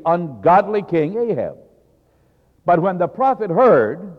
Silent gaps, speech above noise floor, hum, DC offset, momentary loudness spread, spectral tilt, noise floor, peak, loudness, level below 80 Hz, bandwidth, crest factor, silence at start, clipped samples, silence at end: none; 41 dB; none; under 0.1%; 9 LU; -9.5 dB/octave; -58 dBFS; -4 dBFS; -17 LUFS; -58 dBFS; 6 kHz; 14 dB; 0.05 s; under 0.1%; 0.05 s